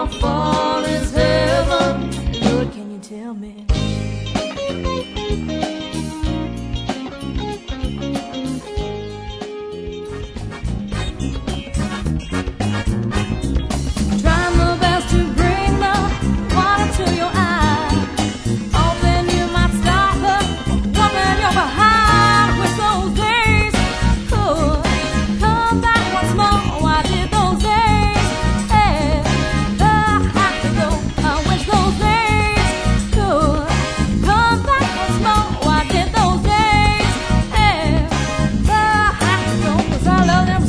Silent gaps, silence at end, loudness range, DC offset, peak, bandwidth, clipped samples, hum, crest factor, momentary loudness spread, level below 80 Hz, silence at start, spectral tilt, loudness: none; 0 s; 10 LU; under 0.1%; 0 dBFS; 11 kHz; under 0.1%; none; 16 dB; 11 LU; -24 dBFS; 0 s; -5 dB/octave; -17 LUFS